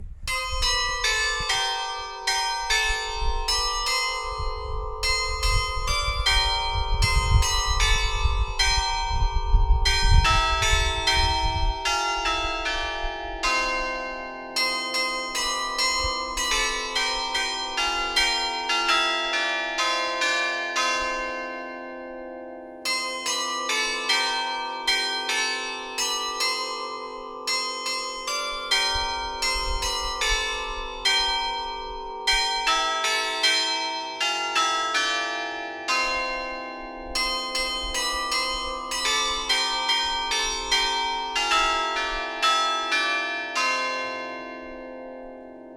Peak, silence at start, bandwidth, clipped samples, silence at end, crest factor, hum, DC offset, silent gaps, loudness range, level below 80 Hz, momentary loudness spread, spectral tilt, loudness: -6 dBFS; 0 s; 16.5 kHz; under 0.1%; 0 s; 20 dB; none; under 0.1%; none; 4 LU; -32 dBFS; 10 LU; -1.5 dB/octave; -24 LUFS